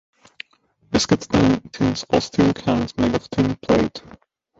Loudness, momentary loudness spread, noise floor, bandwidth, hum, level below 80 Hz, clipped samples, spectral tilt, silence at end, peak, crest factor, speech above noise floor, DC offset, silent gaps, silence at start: -20 LUFS; 21 LU; -60 dBFS; 8 kHz; none; -42 dBFS; under 0.1%; -5.5 dB/octave; 0.6 s; -2 dBFS; 18 dB; 41 dB; under 0.1%; none; 0.9 s